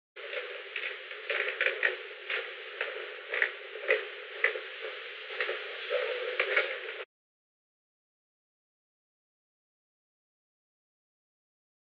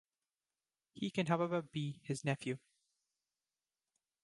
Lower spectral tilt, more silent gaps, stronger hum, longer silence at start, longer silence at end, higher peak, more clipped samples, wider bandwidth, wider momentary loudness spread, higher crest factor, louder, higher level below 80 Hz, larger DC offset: second, 5.5 dB/octave vs -6 dB/octave; neither; neither; second, 0.15 s vs 0.95 s; first, 4.8 s vs 1.65 s; first, -12 dBFS vs -20 dBFS; neither; second, 6.8 kHz vs 11.5 kHz; first, 12 LU vs 9 LU; about the same, 26 dB vs 22 dB; first, -33 LUFS vs -39 LUFS; second, under -90 dBFS vs -80 dBFS; neither